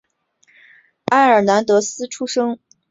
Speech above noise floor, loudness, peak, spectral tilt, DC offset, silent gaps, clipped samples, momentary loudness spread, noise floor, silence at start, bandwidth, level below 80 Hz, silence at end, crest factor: 44 dB; -16 LUFS; -2 dBFS; -4 dB/octave; under 0.1%; none; under 0.1%; 14 LU; -60 dBFS; 1.1 s; 8 kHz; -64 dBFS; 0.35 s; 16 dB